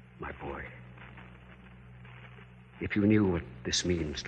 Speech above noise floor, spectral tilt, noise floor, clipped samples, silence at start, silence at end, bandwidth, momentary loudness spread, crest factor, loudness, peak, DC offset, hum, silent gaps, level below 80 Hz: 23 dB; -5 dB/octave; -52 dBFS; under 0.1%; 0.15 s; 0 s; 9.2 kHz; 26 LU; 20 dB; -31 LUFS; -14 dBFS; under 0.1%; none; none; -52 dBFS